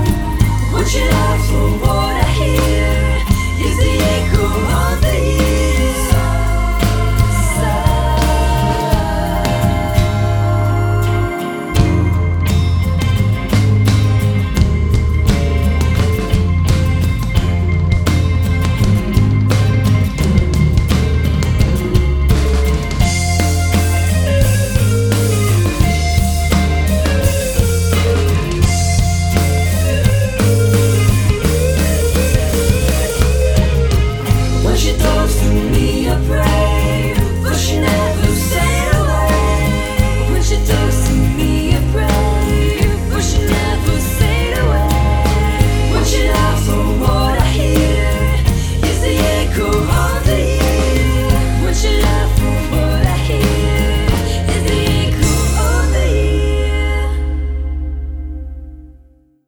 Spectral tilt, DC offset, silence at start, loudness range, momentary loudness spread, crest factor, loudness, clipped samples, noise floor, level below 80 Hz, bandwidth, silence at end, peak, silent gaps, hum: -5.5 dB/octave; under 0.1%; 0 s; 1 LU; 2 LU; 12 dB; -15 LUFS; under 0.1%; -47 dBFS; -16 dBFS; over 20 kHz; 0.55 s; 0 dBFS; none; none